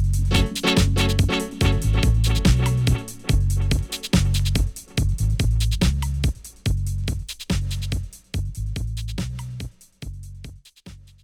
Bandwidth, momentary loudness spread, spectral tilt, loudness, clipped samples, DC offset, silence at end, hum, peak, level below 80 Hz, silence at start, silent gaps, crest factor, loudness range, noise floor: 16.5 kHz; 14 LU; -5 dB/octave; -23 LUFS; under 0.1%; under 0.1%; 0.25 s; none; -8 dBFS; -26 dBFS; 0 s; none; 14 dB; 9 LU; -44 dBFS